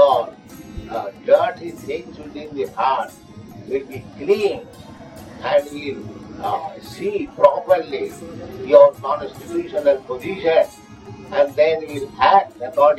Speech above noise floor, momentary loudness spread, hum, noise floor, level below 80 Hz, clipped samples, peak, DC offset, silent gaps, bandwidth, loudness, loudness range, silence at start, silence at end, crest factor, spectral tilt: 19 dB; 21 LU; none; -38 dBFS; -50 dBFS; under 0.1%; 0 dBFS; under 0.1%; none; 12.5 kHz; -19 LUFS; 7 LU; 0 s; 0 s; 20 dB; -5.5 dB/octave